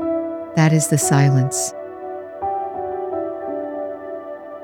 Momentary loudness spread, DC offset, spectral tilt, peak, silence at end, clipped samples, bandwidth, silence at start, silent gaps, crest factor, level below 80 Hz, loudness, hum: 16 LU; under 0.1%; -5.5 dB/octave; -2 dBFS; 0 s; under 0.1%; 18.5 kHz; 0 s; none; 18 dB; -58 dBFS; -20 LUFS; none